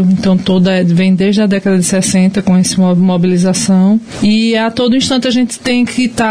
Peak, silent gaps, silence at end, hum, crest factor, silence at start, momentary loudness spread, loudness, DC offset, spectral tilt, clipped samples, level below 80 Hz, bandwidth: -2 dBFS; none; 0 s; none; 8 dB; 0 s; 3 LU; -11 LUFS; under 0.1%; -5.5 dB/octave; under 0.1%; -44 dBFS; 11 kHz